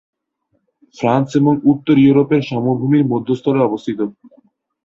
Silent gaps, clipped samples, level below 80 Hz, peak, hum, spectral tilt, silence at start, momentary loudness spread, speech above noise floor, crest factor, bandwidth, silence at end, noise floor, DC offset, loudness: none; under 0.1%; -56 dBFS; -2 dBFS; none; -8.5 dB/octave; 1 s; 10 LU; 53 dB; 14 dB; 7.4 kHz; 0.75 s; -67 dBFS; under 0.1%; -15 LUFS